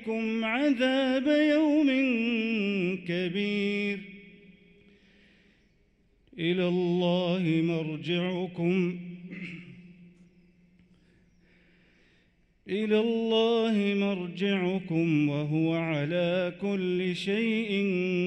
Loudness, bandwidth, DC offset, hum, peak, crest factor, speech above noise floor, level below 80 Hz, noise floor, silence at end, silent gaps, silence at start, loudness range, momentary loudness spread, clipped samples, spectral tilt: -27 LUFS; 9 kHz; under 0.1%; none; -14 dBFS; 14 dB; 39 dB; -68 dBFS; -66 dBFS; 0 s; none; 0 s; 9 LU; 8 LU; under 0.1%; -7 dB/octave